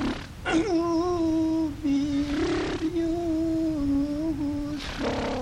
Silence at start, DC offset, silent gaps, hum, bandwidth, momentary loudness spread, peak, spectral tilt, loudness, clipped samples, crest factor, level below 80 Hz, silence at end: 0 s; under 0.1%; none; none; 11.5 kHz; 5 LU; -14 dBFS; -6 dB/octave; -27 LUFS; under 0.1%; 12 dB; -42 dBFS; 0 s